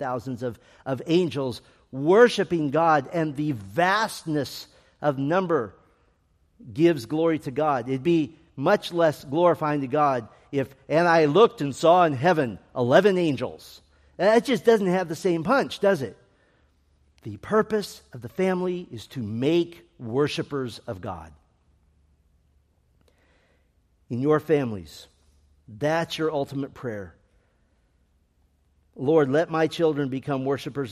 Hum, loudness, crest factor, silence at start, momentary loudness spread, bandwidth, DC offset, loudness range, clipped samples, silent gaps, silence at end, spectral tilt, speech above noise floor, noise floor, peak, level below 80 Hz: none; -24 LUFS; 20 dB; 0 s; 16 LU; 14.5 kHz; under 0.1%; 10 LU; under 0.1%; none; 0 s; -6 dB/octave; 42 dB; -65 dBFS; -4 dBFS; -62 dBFS